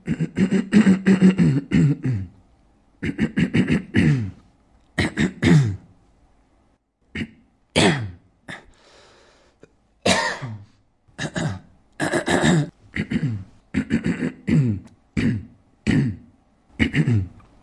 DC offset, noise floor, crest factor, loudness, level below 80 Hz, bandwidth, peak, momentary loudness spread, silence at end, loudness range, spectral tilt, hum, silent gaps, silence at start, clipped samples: under 0.1%; -63 dBFS; 20 dB; -21 LUFS; -46 dBFS; 11.5 kHz; -4 dBFS; 19 LU; 0.35 s; 7 LU; -6 dB/octave; none; none; 0.05 s; under 0.1%